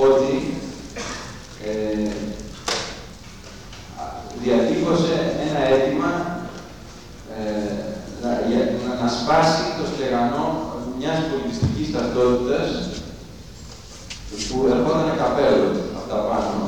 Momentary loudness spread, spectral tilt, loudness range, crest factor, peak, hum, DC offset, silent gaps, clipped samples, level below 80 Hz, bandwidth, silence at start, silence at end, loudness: 20 LU; -5.5 dB/octave; 5 LU; 18 dB; -4 dBFS; none; 0.3%; none; under 0.1%; -42 dBFS; 18.5 kHz; 0 s; 0 s; -22 LUFS